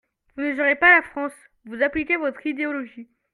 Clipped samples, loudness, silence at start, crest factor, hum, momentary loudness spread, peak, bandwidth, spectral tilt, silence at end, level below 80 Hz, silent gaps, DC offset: under 0.1%; -20 LUFS; 0.35 s; 18 dB; none; 19 LU; -4 dBFS; 12 kHz; -4.5 dB/octave; 0.3 s; -56 dBFS; none; under 0.1%